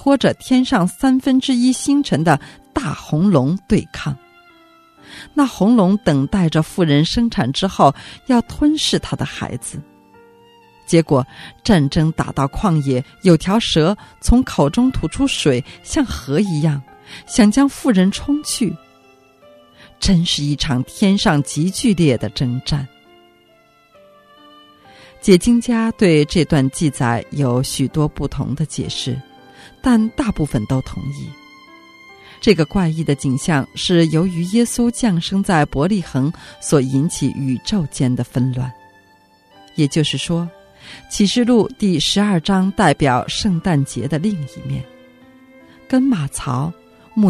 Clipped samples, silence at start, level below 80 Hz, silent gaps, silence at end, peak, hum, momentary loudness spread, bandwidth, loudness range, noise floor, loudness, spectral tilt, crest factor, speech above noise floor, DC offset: under 0.1%; 0 s; -36 dBFS; none; 0 s; 0 dBFS; none; 11 LU; 14 kHz; 5 LU; -53 dBFS; -17 LUFS; -5.5 dB/octave; 18 dB; 36 dB; under 0.1%